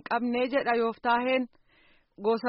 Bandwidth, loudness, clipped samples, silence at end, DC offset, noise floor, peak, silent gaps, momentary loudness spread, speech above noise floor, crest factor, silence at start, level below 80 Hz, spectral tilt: 5.8 kHz; -28 LUFS; under 0.1%; 0 s; under 0.1%; -63 dBFS; -14 dBFS; none; 5 LU; 36 dB; 16 dB; 0.1 s; -68 dBFS; -2 dB/octave